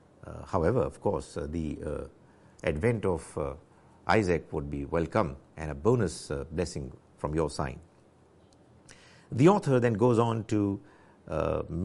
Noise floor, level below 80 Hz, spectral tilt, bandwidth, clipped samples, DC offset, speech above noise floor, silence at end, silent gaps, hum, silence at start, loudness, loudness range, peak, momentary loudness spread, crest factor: -60 dBFS; -48 dBFS; -7 dB/octave; 11.5 kHz; under 0.1%; under 0.1%; 31 dB; 0 s; none; none; 0.25 s; -30 LUFS; 5 LU; -10 dBFS; 15 LU; 20 dB